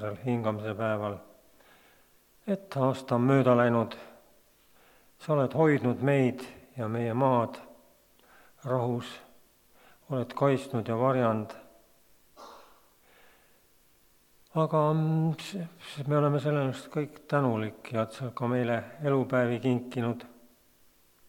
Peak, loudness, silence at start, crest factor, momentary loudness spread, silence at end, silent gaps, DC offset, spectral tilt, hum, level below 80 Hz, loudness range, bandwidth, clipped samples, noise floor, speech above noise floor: -10 dBFS; -29 LUFS; 0 s; 20 dB; 17 LU; 1 s; none; under 0.1%; -8 dB/octave; none; -72 dBFS; 5 LU; 19 kHz; under 0.1%; -63 dBFS; 35 dB